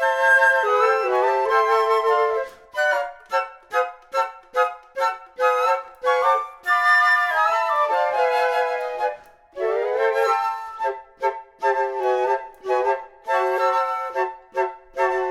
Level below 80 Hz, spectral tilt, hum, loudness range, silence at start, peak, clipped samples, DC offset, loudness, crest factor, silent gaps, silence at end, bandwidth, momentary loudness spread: -64 dBFS; -1 dB/octave; none; 5 LU; 0 s; -6 dBFS; under 0.1%; under 0.1%; -21 LUFS; 16 dB; none; 0 s; 15.5 kHz; 10 LU